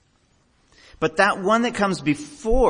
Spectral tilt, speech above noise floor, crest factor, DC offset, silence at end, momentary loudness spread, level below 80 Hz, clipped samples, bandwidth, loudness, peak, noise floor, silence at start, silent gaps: -5 dB/octave; 42 dB; 18 dB; under 0.1%; 0 s; 7 LU; -34 dBFS; under 0.1%; 10.5 kHz; -21 LUFS; -4 dBFS; -62 dBFS; 1 s; none